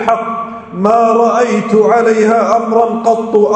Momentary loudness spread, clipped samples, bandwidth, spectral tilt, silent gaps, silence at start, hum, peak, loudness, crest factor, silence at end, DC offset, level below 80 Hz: 7 LU; 0.2%; 9 kHz; -6 dB/octave; none; 0 s; none; 0 dBFS; -11 LUFS; 10 dB; 0 s; under 0.1%; -56 dBFS